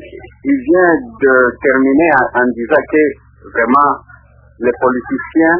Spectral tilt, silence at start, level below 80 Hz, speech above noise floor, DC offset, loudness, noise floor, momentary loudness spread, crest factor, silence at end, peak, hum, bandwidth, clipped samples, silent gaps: -10 dB/octave; 0 s; -44 dBFS; 30 dB; under 0.1%; -13 LUFS; -42 dBFS; 9 LU; 12 dB; 0 s; 0 dBFS; none; 3.3 kHz; under 0.1%; none